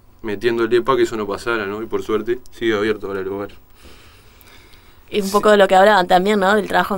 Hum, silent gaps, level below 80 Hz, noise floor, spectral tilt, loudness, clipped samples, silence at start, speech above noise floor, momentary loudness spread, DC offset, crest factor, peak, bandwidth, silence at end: none; none; -44 dBFS; -45 dBFS; -5 dB/octave; -17 LUFS; under 0.1%; 0.25 s; 28 dB; 13 LU; under 0.1%; 16 dB; -2 dBFS; 16.5 kHz; 0 s